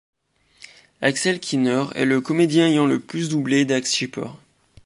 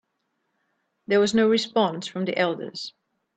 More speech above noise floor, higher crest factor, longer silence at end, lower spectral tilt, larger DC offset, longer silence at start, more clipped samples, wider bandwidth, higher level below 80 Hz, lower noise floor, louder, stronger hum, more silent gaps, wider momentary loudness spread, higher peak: second, 35 dB vs 53 dB; about the same, 18 dB vs 18 dB; about the same, 0.5 s vs 0.5 s; about the same, -4.5 dB/octave vs -4.5 dB/octave; neither; about the same, 1 s vs 1.1 s; neither; first, 11.5 kHz vs 9 kHz; about the same, -66 dBFS vs -68 dBFS; second, -55 dBFS vs -76 dBFS; first, -20 LUFS vs -23 LUFS; neither; neither; second, 7 LU vs 14 LU; first, -4 dBFS vs -8 dBFS